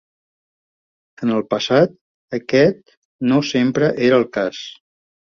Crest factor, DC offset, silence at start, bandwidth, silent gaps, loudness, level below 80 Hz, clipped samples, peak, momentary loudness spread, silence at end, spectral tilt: 18 dB; under 0.1%; 1.2 s; 7.2 kHz; 2.01-2.28 s, 2.97-3.19 s; -18 LUFS; -58 dBFS; under 0.1%; -2 dBFS; 13 LU; 0.65 s; -6 dB/octave